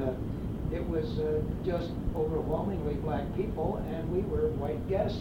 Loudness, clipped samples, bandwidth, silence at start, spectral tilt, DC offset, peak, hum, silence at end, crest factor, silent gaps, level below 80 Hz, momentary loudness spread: -32 LUFS; under 0.1%; 17 kHz; 0 s; -9 dB/octave; under 0.1%; -18 dBFS; none; 0 s; 14 dB; none; -40 dBFS; 4 LU